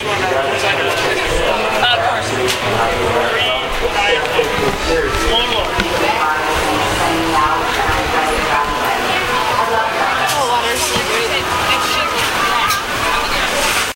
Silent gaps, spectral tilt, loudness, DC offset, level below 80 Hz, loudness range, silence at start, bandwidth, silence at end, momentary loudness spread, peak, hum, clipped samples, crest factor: none; -2.5 dB/octave; -15 LUFS; under 0.1%; -32 dBFS; 0 LU; 0 s; 16 kHz; 0 s; 2 LU; 0 dBFS; none; under 0.1%; 14 dB